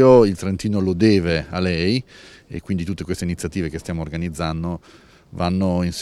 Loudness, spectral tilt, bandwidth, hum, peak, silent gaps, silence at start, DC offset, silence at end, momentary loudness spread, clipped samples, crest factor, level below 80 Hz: -21 LUFS; -6.5 dB/octave; 13 kHz; none; 0 dBFS; none; 0 s; under 0.1%; 0 s; 12 LU; under 0.1%; 20 dB; -40 dBFS